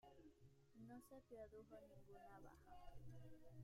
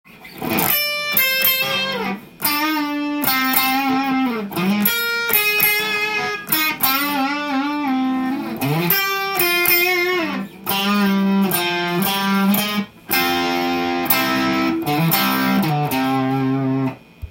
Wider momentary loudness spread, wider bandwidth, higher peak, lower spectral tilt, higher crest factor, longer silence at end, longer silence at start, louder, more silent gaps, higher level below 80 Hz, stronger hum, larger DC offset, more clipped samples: about the same, 5 LU vs 7 LU; about the same, 16 kHz vs 17 kHz; second, -46 dBFS vs 0 dBFS; first, -7 dB/octave vs -4 dB/octave; about the same, 14 dB vs 18 dB; about the same, 0 s vs 0 s; second, 0 s vs 0.15 s; second, -64 LUFS vs -18 LUFS; neither; second, -72 dBFS vs -52 dBFS; neither; neither; neither